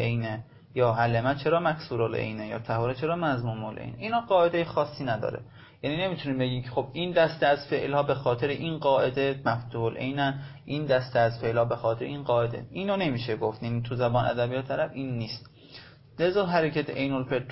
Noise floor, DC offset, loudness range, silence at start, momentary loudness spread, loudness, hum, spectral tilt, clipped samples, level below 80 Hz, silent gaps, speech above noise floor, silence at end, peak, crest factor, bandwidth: -50 dBFS; under 0.1%; 3 LU; 0 s; 11 LU; -28 LUFS; none; -10.5 dB/octave; under 0.1%; -56 dBFS; none; 22 dB; 0 s; -10 dBFS; 16 dB; 5.8 kHz